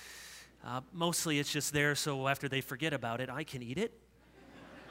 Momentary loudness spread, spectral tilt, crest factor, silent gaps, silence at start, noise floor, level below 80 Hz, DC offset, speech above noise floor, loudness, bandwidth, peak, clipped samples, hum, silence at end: 18 LU; -3.5 dB/octave; 22 dB; none; 0 s; -59 dBFS; -66 dBFS; under 0.1%; 23 dB; -35 LUFS; 16 kHz; -14 dBFS; under 0.1%; none; 0 s